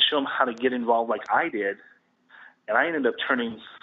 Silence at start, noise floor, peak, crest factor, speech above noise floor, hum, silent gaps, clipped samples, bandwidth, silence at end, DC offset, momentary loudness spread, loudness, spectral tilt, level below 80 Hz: 0 s; -53 dBFS; -6 dBFS; 20 dB; 28 dB; none; none; under 0.1%; 7.2 kHz; 0.05 s; under 0.1%; 8 LU; -25 LUFS; 0.5 dB/octave; -74 dBFS